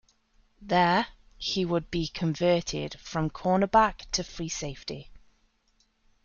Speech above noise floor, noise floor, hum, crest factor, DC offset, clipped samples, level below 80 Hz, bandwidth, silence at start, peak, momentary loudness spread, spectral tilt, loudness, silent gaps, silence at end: 42 dB; -69 dBFS; none; 20 dB; under 0.1%; under 0.1%; -50 dBFS; 7.4 kHz; 0.6 s; -8 dBFS; 13 LU; -4.5 dB/octave; -28 LUFS; none; 1.05 s